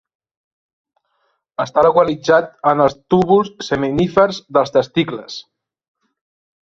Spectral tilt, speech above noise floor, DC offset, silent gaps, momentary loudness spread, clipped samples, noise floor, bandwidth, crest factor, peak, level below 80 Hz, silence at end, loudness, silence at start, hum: -6 dB/octave; 52 dB; under 0.1%; none; 11 LU; under 0.1%; -67 dBFS; 7.6 kHz; 16 dB; -2 dBFS; -50 dBFS; 1.25 s; -16 LUFS; 1.6 s; none